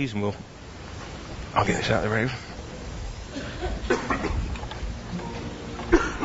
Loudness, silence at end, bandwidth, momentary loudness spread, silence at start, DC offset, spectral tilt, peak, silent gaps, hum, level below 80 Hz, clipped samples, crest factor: -29 LUFS; 0 s; 8 kHz; 14 LU; 0 s; under 0.1%; -5.5 dB/octave; -8 dBFS; none; none; -36 dBFS; under 0.1%; 20 dB